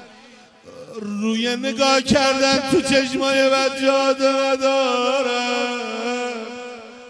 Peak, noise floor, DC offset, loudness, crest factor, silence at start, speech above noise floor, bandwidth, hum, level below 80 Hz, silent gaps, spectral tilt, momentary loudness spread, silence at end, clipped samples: -2 dBFS; -47 dBFS; under 0.1%; -19 LUFS; 18 dB; 0 s; 28 dB; 11 kHz; none; -54 dBFS; none; -3 dB/octave; 13 LU; 0 s; under 0.1%